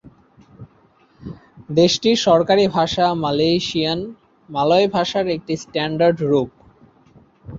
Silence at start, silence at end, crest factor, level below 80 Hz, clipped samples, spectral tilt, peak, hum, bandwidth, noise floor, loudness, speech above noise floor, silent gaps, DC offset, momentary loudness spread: 0.6 s; 0 s; 16 dB; -52 dBFS; under 0.1%; -5 dB/octave; -2 dBFS; none; 7.8 kHz; -55 dBFS; -18 LUFS; 38 dB; none; under 0.1%; 15 LU